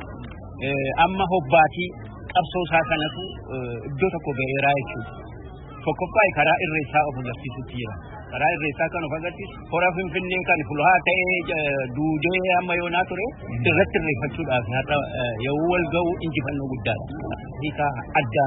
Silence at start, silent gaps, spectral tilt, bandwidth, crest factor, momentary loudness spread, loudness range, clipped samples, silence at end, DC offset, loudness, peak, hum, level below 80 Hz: 0 s; none; -10.5 dB/octave; 4 kHz; 20 dB; 14 LU; 4 LU; under 0.1%; 0 s; under 0.1%; -23 LUFS; -4 dBFS; none; -44 dBFS